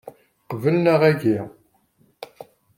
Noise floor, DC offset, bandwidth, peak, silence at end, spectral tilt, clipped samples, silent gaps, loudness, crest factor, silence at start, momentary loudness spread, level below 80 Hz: -62 dBFS; under 0.1%; 16.5 kHz; -4 dBFS; 0.35 s; -8 dB/octave; under 0.1%; none; -19 LUFS; 18 dB; 0.05 s; 24 LU; -64 dBFS